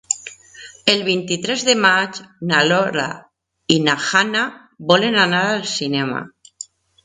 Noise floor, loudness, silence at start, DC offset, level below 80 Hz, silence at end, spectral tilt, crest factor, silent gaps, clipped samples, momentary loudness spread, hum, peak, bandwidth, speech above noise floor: -42 dBFS; -17 LUFS; 0.1 s; under 0.1%; -62 dBFS; 0.4 s; -3 dB/octave; 20 dB; none; under 0.1%; 21 LU; none; 0 dBFS; 10.5 kHz; 24 dB